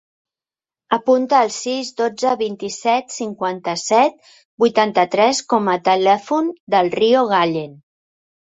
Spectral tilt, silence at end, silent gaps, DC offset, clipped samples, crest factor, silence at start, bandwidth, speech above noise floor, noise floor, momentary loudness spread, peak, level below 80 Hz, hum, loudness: -4 dB/octave; 0.8 s; 4.45-4.58 s, 6.60-6.67 s; under 0.1%; under 0.1%; 18 dB; 0.9 s; 8.2 kHz; over 73 dB; under -90 dBFS; 8 LU; -2 dBFS; -66 dBFS; none; -18 LUFS